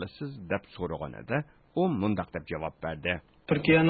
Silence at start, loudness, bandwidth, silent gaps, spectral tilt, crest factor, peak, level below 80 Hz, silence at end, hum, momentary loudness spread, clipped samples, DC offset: 0 s; -32 LUFS; 4.8 kHz; none; -11 dB/octave; 20 dB; -10 dBFS; -52 dBFS; 0 s; none; 9 LU; under 0.1%; under 0.1%